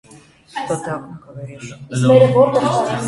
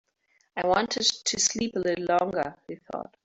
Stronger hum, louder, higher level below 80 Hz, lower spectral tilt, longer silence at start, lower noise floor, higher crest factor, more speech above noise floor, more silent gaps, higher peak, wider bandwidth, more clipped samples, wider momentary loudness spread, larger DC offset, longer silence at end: neither; first, -15 LUFS vs -26 LUFS; first, -54 dBFS vs -62 dBFS; first, -6.5 dB/octave vs -2 dB/octave; about the same, 0.55 s vs 0.55 s; second, -46 dBFS vs -70 dBFS; about the same, 16 dB vs 20 dB; second, 29 dB vs 42 dB; neither; first, 0 dBFS vs -8 dBFS; first, 11.5 kHz vs 8.2 kHz; neither; first, 23 LU vs 14 LU; neither; second, 0 s vs 0.2 s